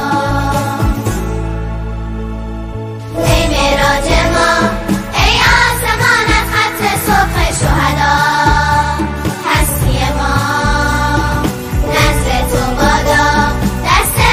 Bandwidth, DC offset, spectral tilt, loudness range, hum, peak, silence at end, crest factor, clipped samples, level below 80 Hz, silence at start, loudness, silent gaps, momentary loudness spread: 16 kHz; under 0.1%; -4 dB/octave; 5 LU; none; 0 dBFS; 0 s; 12 dB; under 0.1%; -20 dBFS; 0 s; -12 LUFS; none; 10 LU